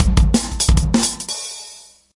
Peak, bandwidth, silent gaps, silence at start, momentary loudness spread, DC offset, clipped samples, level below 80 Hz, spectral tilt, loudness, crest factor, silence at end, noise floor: 0 dBFS; 11.5 kHz; none; 0 s; 15 LU; under 0.1%; under 0.1%; -20 dBFS; -4 dB/octave; -18 LUFS; 16 dB; 0.4 s; -41 dBFS